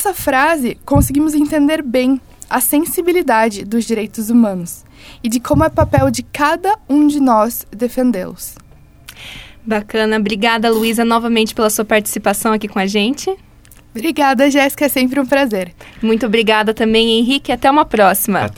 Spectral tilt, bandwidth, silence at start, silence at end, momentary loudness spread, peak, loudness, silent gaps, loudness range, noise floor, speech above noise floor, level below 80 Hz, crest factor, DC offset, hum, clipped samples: -4.5 dB/octave; 18.5 kHz; 0 s; 0.05 s; 10 LU; 0 dBFS; -14 LUFS; none; 3 LU; -43 dBFS; 29 dB; -36 dBFS; 14 dB; under 0.1%; none; under 0.1%